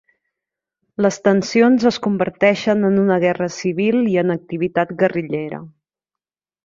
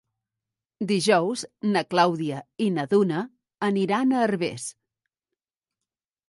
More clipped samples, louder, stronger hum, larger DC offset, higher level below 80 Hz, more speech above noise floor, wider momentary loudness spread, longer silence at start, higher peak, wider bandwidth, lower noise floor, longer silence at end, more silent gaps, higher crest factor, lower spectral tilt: neither; first, -17 LUFS vs -24 LUFS; neither; neither; first, -60 dBFS vs -72 dBFS; first, 71 dB vs 65 dB; about the same, 9 LU vs 10 LU; first, 1 s vs 0.8 s; first, -2 dBFS vs -6 dBFS; second, 7.6 kHz vs 11.5 kHz; about the same, -88 dBFS vs -89 dBFS; second, 0.95 s vs 1.6 s; neither; about the same, 16 dB vs 18 dB; about the same, -6 dB/octave vs -5 dB/octave